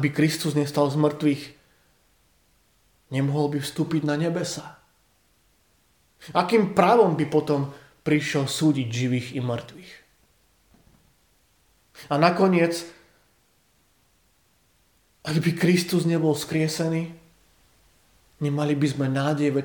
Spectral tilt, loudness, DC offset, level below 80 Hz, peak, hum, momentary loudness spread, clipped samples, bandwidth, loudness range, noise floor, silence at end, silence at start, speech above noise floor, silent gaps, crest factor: -6 dB/octave; -24 LUFS; under 0.1%; -64 dBFS; -4 dBFS; none; 13 LU; under 0.1%; 19 kHz; 6 LU; -64 dBFS; 0 s; 0 s; 42 dB; none; 20 dB